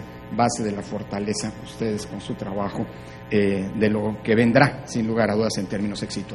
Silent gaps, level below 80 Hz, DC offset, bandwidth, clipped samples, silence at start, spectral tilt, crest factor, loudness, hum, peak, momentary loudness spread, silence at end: none; -48 dBFS; under 0.1%; 12 kHz; under 0.1%; 0 s; -5.5 dB/octave; 24 dB; -24 LUFS; 60 Hz at -45 dBFS; 0 dBFS; 12 LU; 0 s